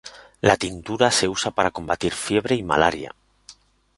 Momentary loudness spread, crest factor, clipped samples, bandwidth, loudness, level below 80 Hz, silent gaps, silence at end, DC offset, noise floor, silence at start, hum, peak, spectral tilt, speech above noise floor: 9 LU; 22 dB; under 0.1%; 11.5 kHz; -21 LUFS; -48 dBFS; none; 0.45 s; under 0.1%; -51 dBFS; 0.05 s; none; -2 dBFS; -3.5 dB/octave; 29 dB